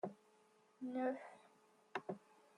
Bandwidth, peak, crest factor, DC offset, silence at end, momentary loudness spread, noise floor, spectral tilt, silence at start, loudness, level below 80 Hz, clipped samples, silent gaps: 11 kHz; -28 dBFS; 20 dB; under 0.1%; 0.4 s; 20 LU; -73 dBFS; -6.5 dB/octave; 0.05 s; -47 LUFS; under -90 dBFS; under 0.1%; none